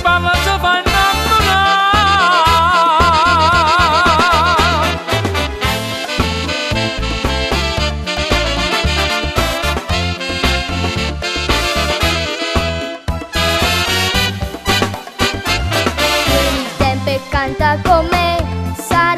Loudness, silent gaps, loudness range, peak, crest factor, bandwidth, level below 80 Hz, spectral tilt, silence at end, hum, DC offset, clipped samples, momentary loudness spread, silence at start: -14 LUFS; none; 6 LU; 0 dBFS; 14 dB; 14 kHz; -24 dBFS; -4 dB/octave; 0 s; none; under 0.1%; under 0.1%; 8 LU; 0 s